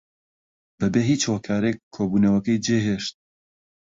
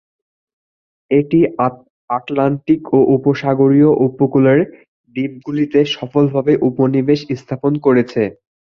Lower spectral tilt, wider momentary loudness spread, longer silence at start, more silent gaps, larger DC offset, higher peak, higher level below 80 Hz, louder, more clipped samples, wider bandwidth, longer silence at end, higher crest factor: second, -5.5 dB/octave vs -8.5 dB/octave; second, 8 LU vs 11 LU; second, 0.8 s vs 1.1 s; second, 1.83-1.91 s vs 1.90-2.08 s, 4.88-5.04 s; neither; second, -8 dBFS vs -2 dBFS; about the same, -54 dBFS vs -56 dBFS; second, -23 LUFS vs -15 LUFS; neither; first, 7.8 kHz vs 6.8 kHz; first, 0.75 s vs 0.4 s; about the same, 16 dB vs 14 dB